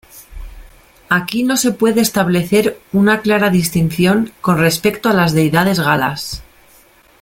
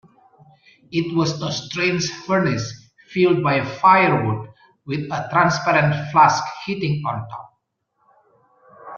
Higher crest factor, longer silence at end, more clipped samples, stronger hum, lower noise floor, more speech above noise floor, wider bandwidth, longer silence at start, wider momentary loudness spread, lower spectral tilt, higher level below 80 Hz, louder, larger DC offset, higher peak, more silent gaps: second, 14 dB vs 20 dB; first, 0.8 s vs 0 s; neither; neither; second, -48 dBFS vs -70 dBFS; second, 34 dB vs 51 dB; first, 17 kHz vs 7.2 kHz; second, 0.15 s vs 0.9 s; second, 4 LU vs 14 LU; about the same, -5 dB/octave vs -5.5 dB/octave; first, -42 dBFS vs -58 dBFS; first, -14 LUFS vs -19 LUFS; neither; about the same, 0 dBFS vs -2 dBFS; neither